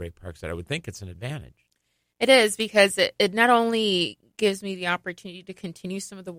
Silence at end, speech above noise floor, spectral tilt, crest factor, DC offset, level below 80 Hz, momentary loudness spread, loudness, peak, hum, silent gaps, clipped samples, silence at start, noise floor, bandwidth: 0 s; 50 dB; -3.5 dB/octave; 22 dB; under 0.1%; -56 dBFS; 20 LU; -22 LUFS; -4 dBFS; none; none; under 0.1%; 0 s; -74 dBFS; 16.5 kHz